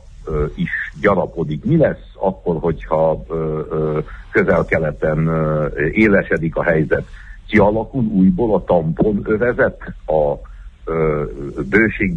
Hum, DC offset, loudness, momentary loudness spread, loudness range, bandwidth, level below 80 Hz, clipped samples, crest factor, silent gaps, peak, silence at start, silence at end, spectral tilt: none; under 0.1%; -18 LUFS; 8 LU; 2 LU; 7.2 kHz; -34 dBFS; under 0.1%; 16 dB; none; 0 dBFS; 0 s; 0 s; -9.5 dB/octave